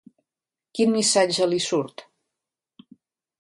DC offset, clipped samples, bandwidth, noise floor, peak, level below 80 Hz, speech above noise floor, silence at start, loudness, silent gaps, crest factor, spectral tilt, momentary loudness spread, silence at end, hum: under 0.1%; under 0.1%; 11.5 kHz; under -90 dBFS; -8 dBFS; -72 dBFS; over 68 dB; 0.75 s; -21 LUFS; none; 18 dB; -3 dB/octave; 13 LU; 1.4 s; none